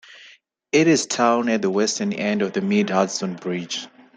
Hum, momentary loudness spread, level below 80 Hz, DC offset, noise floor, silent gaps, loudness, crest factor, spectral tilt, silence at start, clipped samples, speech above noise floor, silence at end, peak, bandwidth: none; 9 LU; -68 dBFS; under 0.1%; -51 dBFS; none; -21 LUFS; 18 dB; -4 dB/octave; 0.1 s; under 0.1%; 31 dB; 0.3 s; -4 dBFS; 9.4 kHz